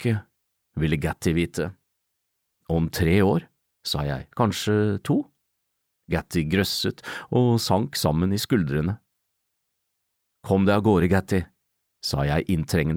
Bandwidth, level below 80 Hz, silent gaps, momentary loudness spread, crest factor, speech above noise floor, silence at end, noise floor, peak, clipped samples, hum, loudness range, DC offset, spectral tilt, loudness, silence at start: 18 kHz; -44 dBFS; none; 10 LU; 18 dB; 55 dB; 0 s; -78 dBFS; -8 dBFS; under 0.1%; none; 2 LU; under 0.1%; -6 dB/octave; -24 LUFS; 0 s